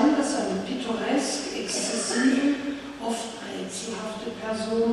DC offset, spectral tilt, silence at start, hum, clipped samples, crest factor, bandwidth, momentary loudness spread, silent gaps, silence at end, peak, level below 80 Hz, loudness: under 0.1%; -3.5 dB/octave; 0 s; none; under 0.1%; 18 dB; 12.5 kHz; 11 LU; none; 0 s; -10 dBFS; -60 dBFS; -27 LUFS